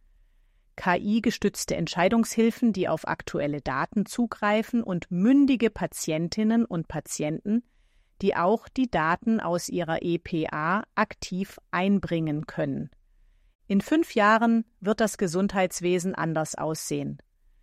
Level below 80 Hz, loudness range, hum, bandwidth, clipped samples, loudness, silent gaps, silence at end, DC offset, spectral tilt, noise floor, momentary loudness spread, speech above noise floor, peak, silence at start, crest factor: -54 dBFS; 3 LU; none; 14.5 kHz; under 0.1%; -26 LUFS; 13.55-13.59 s; 0.45 s; under 0.1%; -5.5 dB/octave; -62 dBFS; 9 LU; 36 dB; -8 dBFS; 0.75 s; 18 dB